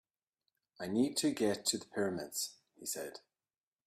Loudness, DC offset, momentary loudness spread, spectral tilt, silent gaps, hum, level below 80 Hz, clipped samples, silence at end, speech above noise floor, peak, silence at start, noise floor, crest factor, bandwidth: -36 LUFS; under 0.1%; 13 LU; -3 dB/octave; none; none; -78 dBFS; under 0.1%; 0.7 s; over 54 dB; -18 dBFS; 0.8 s; under -90 dBFS; 20 dB; 15.5 kHz